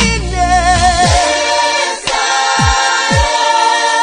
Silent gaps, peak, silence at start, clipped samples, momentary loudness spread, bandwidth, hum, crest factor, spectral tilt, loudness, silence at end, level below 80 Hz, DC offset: none; 0 dBFS; 0 s; under 0.1%; 4 LU; 10 kHz; none; 12 dB; -3 dB/octave; -11 LUFS; 0 s; -22 dBFS; under 0.1%